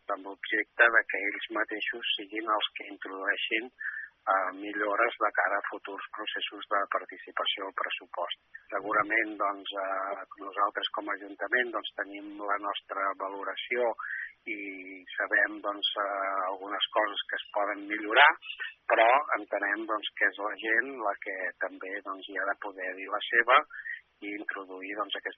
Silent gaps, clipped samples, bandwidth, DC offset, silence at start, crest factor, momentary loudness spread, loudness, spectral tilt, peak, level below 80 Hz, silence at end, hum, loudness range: none; under 0.1%; 5.6 kHz; under 0.1%; 0.1 s; 26 dB; 14 LU; -30 LUFS; 2.5 dB/octave; -6 dBFS; -84 dBFS; 0.05 s; none; 6 LU